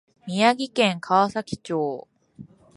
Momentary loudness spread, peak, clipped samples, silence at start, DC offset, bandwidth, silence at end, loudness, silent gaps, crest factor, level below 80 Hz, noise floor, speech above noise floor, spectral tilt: 11 LU; -4 dBFS; under 0.1%; 0.25 s; under 0.1%; 11.5 kHz; 0.3 s; -23 LUFS; none; 20 dB; -62 dBFS; -47 dBFS; 25 dB; -5 dB/octave